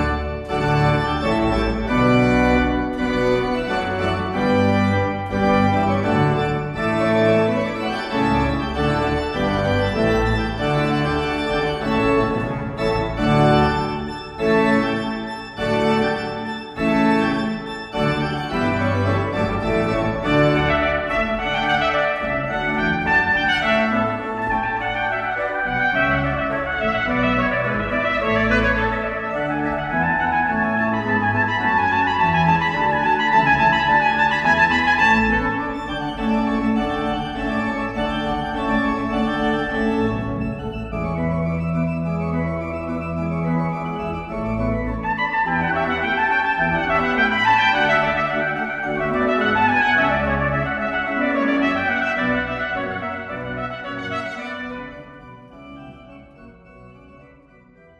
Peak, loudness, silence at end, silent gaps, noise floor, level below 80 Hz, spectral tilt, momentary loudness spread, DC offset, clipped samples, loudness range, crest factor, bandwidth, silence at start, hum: -4 dBFS; -20 LUFS; 0.75 s; none; -49 dBFS; -36 dBFS; -6.5 dB/octave; 9 LU; under 0.1%; under 0.1%; 6 LU; 16 dB; 11.5 kHz; 0 s; none